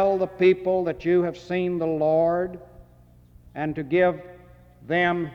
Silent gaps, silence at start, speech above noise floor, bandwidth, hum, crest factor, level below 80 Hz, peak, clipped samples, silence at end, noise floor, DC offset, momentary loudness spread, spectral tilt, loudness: none; 0 s; 30 dB; 6.4 kHz; none; 16 dB; -54 dBFS; -8 dBFS; under 0.1%; 0 s; -53 dBFS; under 0.1%; 11 LU; -8 dB/octave; -23 LUFS